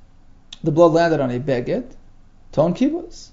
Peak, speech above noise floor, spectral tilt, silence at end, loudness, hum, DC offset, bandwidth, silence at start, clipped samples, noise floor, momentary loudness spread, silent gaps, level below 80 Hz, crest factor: -2 dBFS; 28 dB; -7.5 dB/octave; 0.1 s; -19 LUFS; none; under 0.1%; 7.8 kHz; 0.5 s; under 0.1%; -46 dBFS; 12 LU; none; -44 dBFS; 18 dB